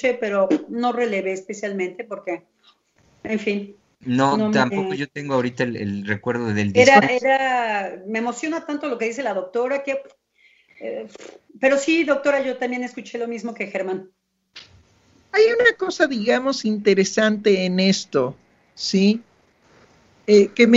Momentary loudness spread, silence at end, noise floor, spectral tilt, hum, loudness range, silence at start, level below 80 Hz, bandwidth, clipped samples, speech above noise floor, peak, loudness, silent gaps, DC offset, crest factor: 14 LU; 0 s; -58 dBFS; -5 dB/octave; none; 8 LU; 0 s; -66 dBFS; 8 kHz; under 0.1%; 38 dB; 0 dBFS; -20 LUFS; none; under 0.1%; 20 dB